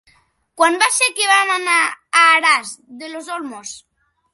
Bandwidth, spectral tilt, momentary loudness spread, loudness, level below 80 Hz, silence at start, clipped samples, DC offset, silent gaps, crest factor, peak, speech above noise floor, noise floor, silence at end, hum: 12 kHz; 1.5 dB/octave; 21 LU; -14 LUFS; -72 dBFS; 0.55 s; under 0.1%; under 0.1%; none; 18 dB; 0 dBFS; 41 dB; -57 dBFS; 0.55 s; none